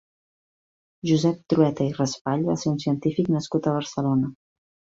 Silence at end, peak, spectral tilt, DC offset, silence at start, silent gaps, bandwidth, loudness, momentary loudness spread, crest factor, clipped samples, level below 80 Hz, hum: 0.6 s; -6 dBFS; -7 dB/octave; under 0.1%; 1.05 s; 2.21-2.25 s; 8 kHz; -24 LUFS; 4 LU; 20 dB; under 0.1%; -60 dBFS; none